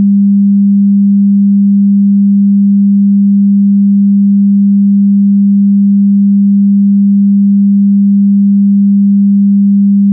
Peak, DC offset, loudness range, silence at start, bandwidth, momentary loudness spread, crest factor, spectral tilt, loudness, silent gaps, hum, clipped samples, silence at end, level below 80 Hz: -4 dBFS; under 0.1%; 0 LU; 0 s; 0.3 kHz; 0 LU; 4 dB; -21.5 dB/octave; -7 LUFS; none; none; under 0.1%; 0 s; -74 dBFS